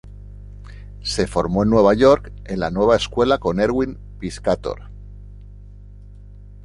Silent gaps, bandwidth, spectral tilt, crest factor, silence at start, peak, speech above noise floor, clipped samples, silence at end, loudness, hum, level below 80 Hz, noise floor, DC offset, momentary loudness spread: none; 11.5 kHz; -6 dB/octave; 18 dB; 0.05 s; -2 dBFS; 22 dB; under 0.1%; 0 s; -19 LUFS; 50 Hz at -35 dBFS; -36 dBFS; -40 dBFS; under 0.1%; 25 LU